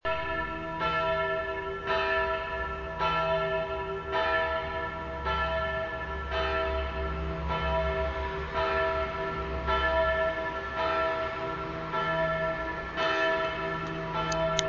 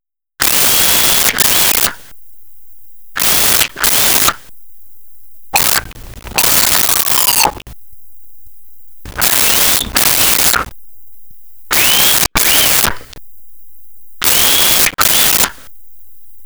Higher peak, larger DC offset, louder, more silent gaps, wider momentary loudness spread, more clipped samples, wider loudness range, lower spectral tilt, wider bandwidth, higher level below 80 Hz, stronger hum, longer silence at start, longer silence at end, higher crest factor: second, -6 dBFS vs 0 dBFS; second, under 0.1% vs 1%; second, -30 LUFS vs -9 LUFS; neither; about the same, 7 LU vs 8 LU; neither; about the same, 2 LU vs 2 LU; first, -4.5 dB/octave vs 0 dB/octave; second, 7.6 kHz vs over 20 kHz; second, -42 dBFS vs -36 dBFS; neither; about the same, 0.05 s vs 0 s; about the same, 0 s vs 0 s; first, 24 dB vs 14 dB